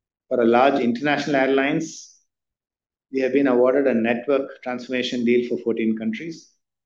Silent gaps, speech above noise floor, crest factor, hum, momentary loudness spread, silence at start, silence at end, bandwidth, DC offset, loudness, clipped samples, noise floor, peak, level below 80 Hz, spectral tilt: none; 52 dB; 16 dB; none; 13 LU; 0.3 s; 0.45 s; 7.6 kHz; under 0.1%; -21 LUFS; under 0.1%; -73 dBFS; -4 dBFS; -68 dBFS; -5.5 dB/octave